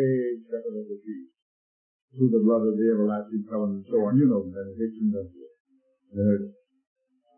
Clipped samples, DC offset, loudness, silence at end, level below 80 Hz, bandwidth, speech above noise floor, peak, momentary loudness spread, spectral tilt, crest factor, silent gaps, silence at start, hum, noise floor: under 0.1%; under 0.1%; -26 LUFS; 0.85 s; -70 dBFS; 3.1 kHz; over 66 dB; -10 dBFS; 16 LU; -14 dB/octave; 16 dB; 1.42-2.08 s, 5.60-5.65 s; 0 s; none; under -90 dBFS